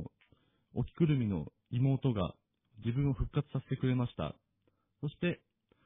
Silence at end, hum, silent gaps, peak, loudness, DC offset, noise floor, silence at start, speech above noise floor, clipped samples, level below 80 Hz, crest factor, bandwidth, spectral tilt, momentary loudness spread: 0.5 s; none; none; -18 dBFS; -35 LUFS; under 0.1%; -77 dBFS; 0 s; 44 dB; under 0.1%; -52 dBFS; 18 dB; 3.9 kHz; -11.5 dB/octave; 12 LU